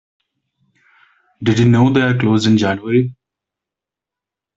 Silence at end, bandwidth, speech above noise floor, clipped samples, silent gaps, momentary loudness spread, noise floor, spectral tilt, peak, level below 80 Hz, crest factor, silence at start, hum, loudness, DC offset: 1.45 s; 7.8 kHz; 73 dB; under 0.1%; none; 7 LU; -86 dBFS; -7 dB/octave; -2 dBFS; -52 dBFS; 16 dB; 1.4 s; none; -15 LUFS; under 0.1%